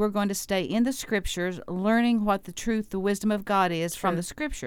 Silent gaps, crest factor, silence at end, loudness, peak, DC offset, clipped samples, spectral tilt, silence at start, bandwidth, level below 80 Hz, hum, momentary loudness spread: none; 16 dB; 0 s; -27 LUFS; -10 dBFS; under 0.1%; under 0.1%; -5 dB/octave; 0 s; 17.5 kHz; -46 dBFS; none; 7 LU